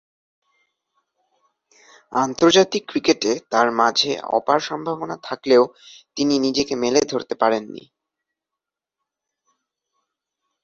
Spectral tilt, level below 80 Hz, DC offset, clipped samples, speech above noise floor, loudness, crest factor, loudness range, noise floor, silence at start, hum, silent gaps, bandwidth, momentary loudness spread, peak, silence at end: -3.5 dB/octave; -62 dBFS; under 0.1%; under 0.1%; 67 dB; -20 LUFS; 20 dB; 6 LU; -86 dBFS; 2.1 s; none; none; 7.8 kHz; 11 LU; -2 dBFS; 2.85 s